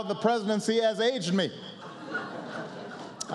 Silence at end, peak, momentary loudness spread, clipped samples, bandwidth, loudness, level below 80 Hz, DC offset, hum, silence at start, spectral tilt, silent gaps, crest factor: 0 s; -12 dBFS; 16 LU; under 0.1%; 12 kHz; -29 LUFS; -82 dBFS; under 0.1%; none; 0 s; -4.5 dB/octave; none; 18 dB